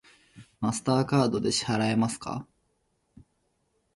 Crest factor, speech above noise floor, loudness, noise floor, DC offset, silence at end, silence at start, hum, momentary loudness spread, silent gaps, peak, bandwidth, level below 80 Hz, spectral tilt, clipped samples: 18 dB; 47 dB; -27 LUFS; -73 dBFS; under 0.1%; 1.5 s; 0.35 s; none; 11 LU; none; -10 dBFS; 11.5 kHz; -60 dBFS; -5 dB/octave; under 0.1%